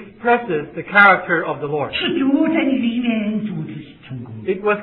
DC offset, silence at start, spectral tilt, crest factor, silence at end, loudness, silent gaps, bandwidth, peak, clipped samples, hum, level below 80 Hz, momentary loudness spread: under 0.1%; 0 s; -9 dB/octave; 18 dB; 0 s; -17 LUFS; none; 5.2 kHz; 0 dBFS; under 0.1%; none; -56 dBFS; 19 LU